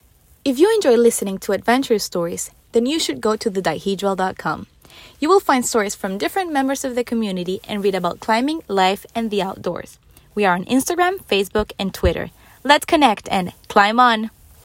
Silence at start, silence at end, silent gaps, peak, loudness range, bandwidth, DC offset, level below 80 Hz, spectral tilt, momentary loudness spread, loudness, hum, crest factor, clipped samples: 0.45 s; 0.35 s; none; 0 dBFS; 3 LU; 16.5 kHz; under 0.1%; -42 dBFS; -4 dB/octave; 10 LU; -19 LUFS; none; 18 dB; under 0.1%